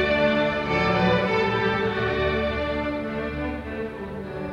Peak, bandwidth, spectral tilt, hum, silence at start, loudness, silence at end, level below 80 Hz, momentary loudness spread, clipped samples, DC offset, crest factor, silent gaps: -10 dBFS; 10.5 kHz; -7 dB/octave; none; 0 s; -24 LUFS; 0 s; -40 dBFS; 11 LU; under 0.1%; under 0.1%; 14 dB; none